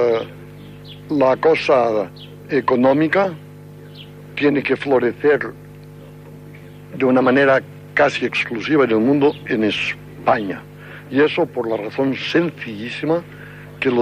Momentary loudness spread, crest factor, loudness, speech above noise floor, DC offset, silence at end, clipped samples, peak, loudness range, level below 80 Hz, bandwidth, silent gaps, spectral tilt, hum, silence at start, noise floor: 23 LU; 16 dB; -18 LUFS; 21 dB; under 0.1%; 0 s; under 0.1%; -4 dBFS; 4 LU; -54 dBFS; 15 kHz; none; -6.5 dB/octave; 50 Hz at -40 dBFS; 0 s; -38 dBFS